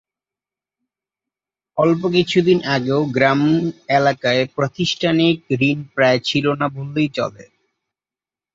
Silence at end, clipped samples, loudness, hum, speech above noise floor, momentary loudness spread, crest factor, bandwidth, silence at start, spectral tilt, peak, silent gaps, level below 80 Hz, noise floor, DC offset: 1.15 s; under 0.1%; -18 LUFS; none; over 73 dB; 6 LU; 18 dB; 7.8 kHz; 1.75 s; -6 dB/octave; -2 dBFS; none; -58 dBFS; under -90 dBFS; under 0.1%